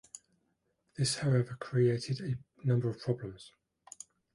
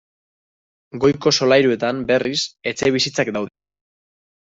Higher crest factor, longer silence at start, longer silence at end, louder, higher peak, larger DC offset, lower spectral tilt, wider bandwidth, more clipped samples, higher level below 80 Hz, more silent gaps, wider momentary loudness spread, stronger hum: about the same, 16 dB vs 18 dB; second, 0.15 s vs 0.95 s; about the same, 0.85 s vs 0.95 s; second, -33 LUFS vs -18 LUFS; second, -18 dBFS vs -2 dBFS; neither; first, -6 dB/octave vs -4 dB/octave; first, 11.5 kHz vs 8 kHz; neither; second, -66 dBFS vs -56 dBFS; neither; first, 22 LU vs 10 LU; neither